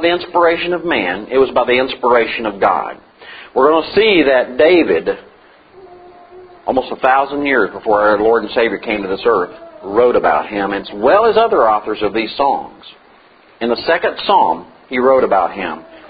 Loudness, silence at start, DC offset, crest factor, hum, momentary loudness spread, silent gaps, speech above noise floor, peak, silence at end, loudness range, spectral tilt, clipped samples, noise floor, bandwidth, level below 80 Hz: -14 LUFS; 0 s; under 0.1%; 14 dB; none; 10 LU; none; 32 dB; 0 dBFS; 0 s; 3 LU; -8 dB/octave; under 0.1%; -46 dBFS; 5 kHz; -48 dBFS